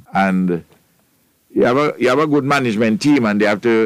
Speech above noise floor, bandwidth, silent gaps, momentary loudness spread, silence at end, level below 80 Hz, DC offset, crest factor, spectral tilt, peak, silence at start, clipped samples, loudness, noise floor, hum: 44 dB; 15 kHz; none; 5 LU; 0 s; -56 dBFS; under 0.1%; 12 dB; -6.5 dB/octave; -4 dBFS; 0.15 s; under 0.1%; -16 LUFS; -59 dBFS; none